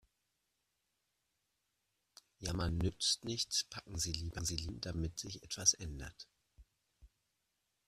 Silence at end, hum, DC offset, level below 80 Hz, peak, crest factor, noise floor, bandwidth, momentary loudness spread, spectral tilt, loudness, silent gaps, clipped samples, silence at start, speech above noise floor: 0.8 s; none; under 0.1%; -54 dBFS; -14 dBFS; 28 dB; -85 dBFS; 14.5 kHz; 15 LU; -2.5 dB/octave; -37 LUFS; none; under 0.1%; 2.4 s; 46 dB